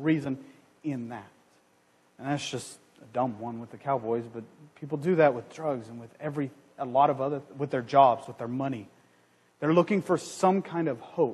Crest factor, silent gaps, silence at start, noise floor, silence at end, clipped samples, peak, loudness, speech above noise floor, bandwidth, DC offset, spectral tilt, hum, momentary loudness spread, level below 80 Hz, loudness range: 22 dB; none; 0 s; -65 dBFS; 0 s; under 0.1%; -6 dBFS; -29 LUFS; 37 dB; 12 kHz; under 0.1%; -6.5 dB/octave; none; 16 LU; -74 dBFS; 9 LU